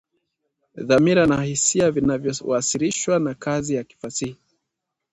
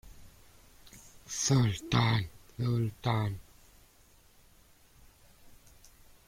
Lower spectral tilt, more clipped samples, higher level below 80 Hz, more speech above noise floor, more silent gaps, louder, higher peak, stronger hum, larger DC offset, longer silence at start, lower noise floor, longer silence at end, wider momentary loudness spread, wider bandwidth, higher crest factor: about the same, -4.5 dB/octave vs -5 dB/octave; neither; about the same, -52 dBFS vs -56 dBFS; first, 61 dB vs 32 dB; neither; first, -21 LUFS vs -31 LUFS; first, -4 dBFS vs -12 dBFS; neither; neither; first, 0.75 s vs 0.05 s; first, -81 dBFS vs -61 dBFS; about the same, 0.8 s vs 0.75 s; second, 12 LU vs 26 LU; second, 10.5 kHz vs 16 kHz; about the same, 18 dB vs 22 dB